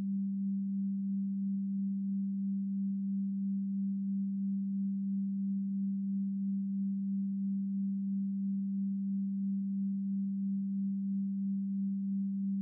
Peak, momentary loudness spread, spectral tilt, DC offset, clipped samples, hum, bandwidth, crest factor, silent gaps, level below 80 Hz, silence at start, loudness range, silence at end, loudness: -30 dBFS; 0 LU; -24 dB/octave; under 0.1%; under 0.1%; none; 0.3 kHz; 4 dB; none; under -90 dBFS; 0 s; 0 LU; 0 s; -35 LUFS